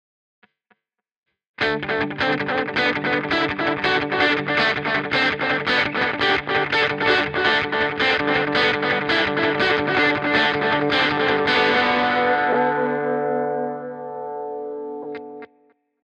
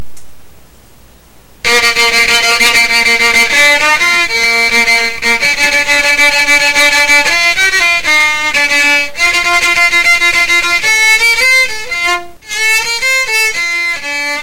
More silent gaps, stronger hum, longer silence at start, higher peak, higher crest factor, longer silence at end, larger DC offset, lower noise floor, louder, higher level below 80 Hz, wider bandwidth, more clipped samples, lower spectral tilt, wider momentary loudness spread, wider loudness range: neither; neither; first, 1.6 s vs 0 s; second, -6 dBFS vs 0 dBFS; first, 16 dB vs 10 dB; first, 0.6 s vs 0 s; neither; first, -80 dBFS vs -41 dBFS; second, -20 LUFS vs -8 LUFS; second, -54 dBFS vs -38 dBFS; second, 8.8 kHz vs 17 kHz; neither; first, -5 dB/octave vs 0.5 dB/octave; first, 12 LU vs 6 LU; first, 5 LU vs 2 LU